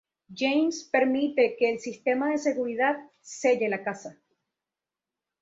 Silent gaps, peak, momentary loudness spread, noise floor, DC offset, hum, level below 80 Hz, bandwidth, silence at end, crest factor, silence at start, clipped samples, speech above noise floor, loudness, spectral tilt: none; -10 dBFS; 12 LU; -90 dBFS; under 0.1%; none; -76 dBFS; 8 kHz; 1.3 s; 18 dB; 0.3 s; under 0.1%; 63 dB; -26 LUFS; -4 dB/octave